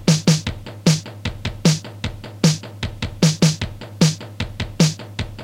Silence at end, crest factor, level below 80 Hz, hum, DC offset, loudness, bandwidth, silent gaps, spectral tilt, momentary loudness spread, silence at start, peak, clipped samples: 0 s; 18 dB; -38 dBFS; none; under 0.1%; -20 LUFS; 15.5 kHz; none; -5 dB/octave; 13 LU; 0 s; -2 dBFS; under 0.1%